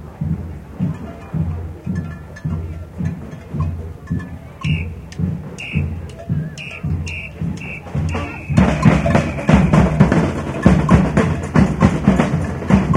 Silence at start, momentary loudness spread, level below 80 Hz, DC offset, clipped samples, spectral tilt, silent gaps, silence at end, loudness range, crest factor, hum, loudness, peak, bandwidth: 0 s; 14 LU; -28 dBFS; under 0.1%; under 0.1%; -7.5 dB/octave; none; 0 s; 11 LU; 18 dB; none; -18 LUFS; 0 dBFS; 11 kHz